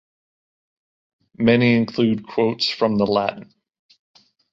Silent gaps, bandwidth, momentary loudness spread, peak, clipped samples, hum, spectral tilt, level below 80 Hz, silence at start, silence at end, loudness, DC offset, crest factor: none; 7.6 kHz; 6 LU; -4 dBFS; under 0.1%; none; -7 dB/octave; -58 dBFS; 1.4 s; 1.1 s; -19 LUFS; under 0.1%; 18 dB